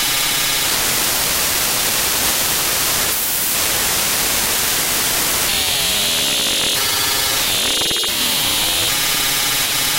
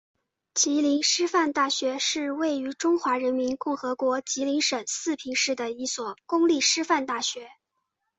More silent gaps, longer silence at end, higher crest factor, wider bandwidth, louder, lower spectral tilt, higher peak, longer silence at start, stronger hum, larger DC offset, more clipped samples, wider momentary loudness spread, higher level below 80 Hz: neither; second, 0 s vs 0.7 s; about the same, 14 dB vs 18 dB; first, 16 kHz vs 8.4 kHz; first, -15 LUFS vs -25 LUFS; about the same, 0 dB/octave vs -0.5 dB/octave; first, -4 dBFS vs -8 dBFS; second, 0 s vs 0.55 s; neither; neither; neither; second, 0 LU vs 8 LU; first, -40 dBFS vs -72 dBFS